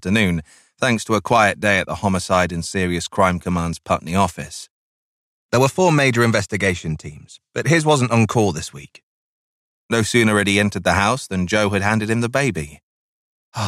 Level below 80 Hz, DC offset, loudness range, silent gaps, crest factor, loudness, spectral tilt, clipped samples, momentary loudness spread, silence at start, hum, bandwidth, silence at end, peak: -46 dBFS; under 0.1%; 3 LU; 4.70-5.49 s, 9.03-9.89 s, 12.83-13.52 s; 16 dB; -18 LUFS; -5 dB/octave; under 0.1%; 13 LU; 0.05 s; none; 15.5 kHz; 0 s; -4 dBFS